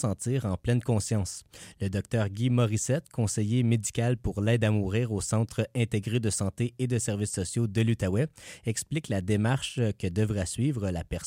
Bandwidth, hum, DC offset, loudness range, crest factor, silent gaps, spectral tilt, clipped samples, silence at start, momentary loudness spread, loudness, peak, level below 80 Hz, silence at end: 16 kHz; none; under 0.1%; 2 LU; 14 dB; none; -5.5 dB/octave; under 0.1%; 0 s; 6 LU; -29 LUFS; -14 dBFS; -50 dBFS; 0 s